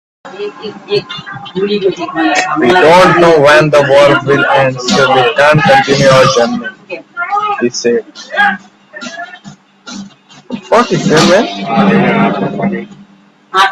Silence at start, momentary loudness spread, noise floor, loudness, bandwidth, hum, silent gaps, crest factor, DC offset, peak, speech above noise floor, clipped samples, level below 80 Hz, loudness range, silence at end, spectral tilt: 0.25 s; 19 LU; -43 dBFS; -9 LUFS; 13.5 kHz; none; none; 10 dB; under 0.1%; 0 dBFS; 34 dB; 0.1%; -46 dBFS; 9 LU; 0 s; -5 dB/octave